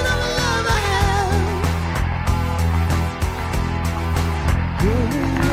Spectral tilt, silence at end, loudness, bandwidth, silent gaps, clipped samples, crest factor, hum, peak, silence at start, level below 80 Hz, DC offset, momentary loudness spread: -5.5 dB/octave; 0 s; -20 LUFS; 15.5 kHz; none; under 0.1%; 16 dB; none; -4 dBFS; 0 s; -26 dBFS; under 0.1%; 4 LU